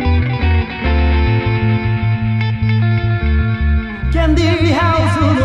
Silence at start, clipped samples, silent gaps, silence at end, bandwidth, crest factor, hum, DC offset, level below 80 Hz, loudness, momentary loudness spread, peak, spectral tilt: 0 s; under 0.1%; none; 0 s; 9 kHz; 12 dB; none; under 0.1%; -20 dBFS; -15 LUFS; 4 LU; -2 dBFS; -7.5 dB/octave